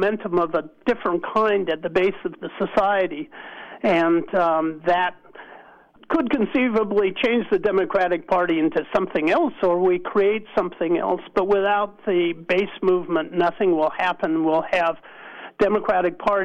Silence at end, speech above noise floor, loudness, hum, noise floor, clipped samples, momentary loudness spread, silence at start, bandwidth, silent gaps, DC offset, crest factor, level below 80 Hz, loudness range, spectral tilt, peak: 0 s; 28 dB; -21 LUFS; none; -49 dBFS; under 0.1%; 6 LU; 0 s; 7.6 kHz; none; under 0.1%; 12 dB; -54 dBFS; 2 LU; -7 dB/octave; -10 dBFS